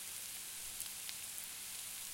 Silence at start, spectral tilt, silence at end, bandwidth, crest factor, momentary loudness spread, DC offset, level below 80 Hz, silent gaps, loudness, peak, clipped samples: 0 s; 1.5 dB/octave; 0 s; 17 kHz; 28 dB; 1 LU; under 0.1%; -74 dBFS; none; -43 LUFS; -20 dBFS; under 0.1%